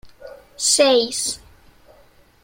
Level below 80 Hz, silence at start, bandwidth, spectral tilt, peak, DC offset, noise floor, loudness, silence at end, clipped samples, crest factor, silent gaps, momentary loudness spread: -56 dBFS; 0.05 s; 16.5 kHz; -0.5 dB/octave; -2 dBFS; under 0.1%; -52 dBFS; -17 LUFS; 1.05 s; under 0.1%; 20 dB; none; 11 LU